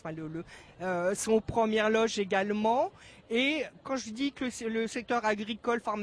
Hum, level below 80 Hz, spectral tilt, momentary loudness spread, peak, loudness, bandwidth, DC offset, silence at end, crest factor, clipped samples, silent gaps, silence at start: none; -60 dBFS; -4 dB/octave; 10 LU; -14 dBFS; -30 LUFS; 11 kHz; under 0.1%; 0 s; 16 dB; under 0.1%; none; 0.05 s